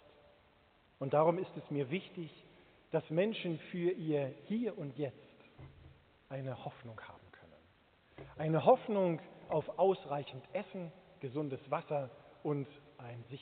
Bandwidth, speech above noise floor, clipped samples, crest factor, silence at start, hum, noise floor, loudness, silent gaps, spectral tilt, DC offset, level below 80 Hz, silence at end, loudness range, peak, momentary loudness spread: 4.5 kHz; 32 dB; under 0.1%; 24 dB; 1 s; none; -68 dBFS; -37 LUFS; none; -6 dB/octave; under 0.1%; -74 dBFS; 0 s; 10 LU; -14 dBFS; 20 LU